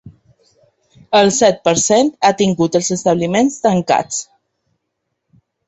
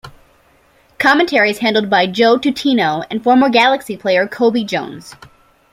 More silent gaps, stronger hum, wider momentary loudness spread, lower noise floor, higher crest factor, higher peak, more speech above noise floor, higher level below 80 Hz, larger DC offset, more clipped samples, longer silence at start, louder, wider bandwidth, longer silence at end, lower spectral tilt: neither; neither; second, 4 LU vs 8 LU; first, -74 dBFS vs -52 dBFS; about the same, 16 dB vs 14 dB; about the same, 0 dBFS vs 0 dBFS; first, 60 dB vs 38 dB; about the same, -54 dBFS vs -56 dBFS; neither; neither; about the same, 0.05 s vs 0.05 s; about the same, -14 LUFS vs -14 LUFS; second, 8.2 kHz vs 15.5 kHz; first, 1.45 s vs 0.6 s; about the same, -4 dB/octave vs -4.5 dB/octave